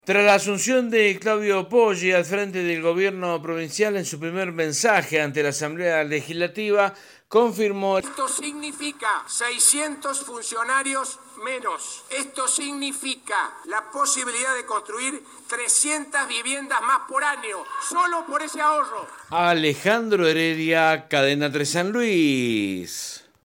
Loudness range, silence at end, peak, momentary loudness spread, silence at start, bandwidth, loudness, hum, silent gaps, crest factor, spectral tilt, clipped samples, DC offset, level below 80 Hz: 4 LU; 0.25 s; -4 dBFS; 10 LU; 0.05 s; 17 kHz; -22 LUFS; none; none; 18 dB; -2.5 dB/octave; under 0.1%; under 0.1%; -72 dBFS